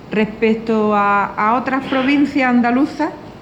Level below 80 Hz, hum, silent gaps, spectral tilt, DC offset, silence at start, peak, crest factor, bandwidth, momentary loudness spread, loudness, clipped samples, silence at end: -50 dBFS; none; none; -6.5 dB/octave; under 0.1%; 0 s; -2 dBFS; 14 dB; 8.2 kHz; 5 LU; -16 LUFS; under 0.1%; 0 s